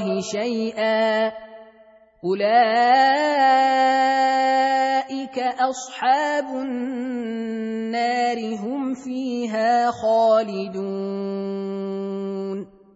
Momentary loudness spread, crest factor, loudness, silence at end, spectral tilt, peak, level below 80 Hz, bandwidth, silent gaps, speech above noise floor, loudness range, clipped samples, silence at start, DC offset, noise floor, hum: 11 LU; 16 dB; -21 LUFS; 0.3 s; -4.5 dB/octave; -4 dBFS; -70 dBFS; 8 kHz; none; 31 dB; 6 LU; under 0.1%; 0 s; under 0.1%; -52 dBFS; none